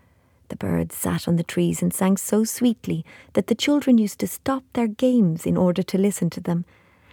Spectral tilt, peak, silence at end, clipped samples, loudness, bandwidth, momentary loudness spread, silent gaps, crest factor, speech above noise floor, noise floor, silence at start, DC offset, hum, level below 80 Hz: -6 dB/octave; -8 dBFS; 0.5 s; under 0.1%; -22 LUFS; 19.5 kHz; 8 LU; none; 16 dB; 37 dB; -58 dBFS; 0.5 s; under 0.1%; none; -54 dBFS